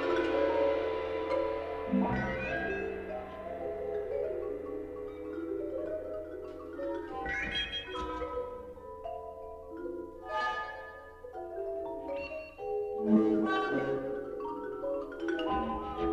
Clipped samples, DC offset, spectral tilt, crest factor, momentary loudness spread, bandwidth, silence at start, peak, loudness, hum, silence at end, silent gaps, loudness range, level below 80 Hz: under 0.1%; under 0.1%; -6.5 dB/octave; 20 dB; 13 LU; 9.6 kHz; 0 s; -14 dBFS; -35 LUFS; none; 0 s; none; 7 LU; -54 dBFS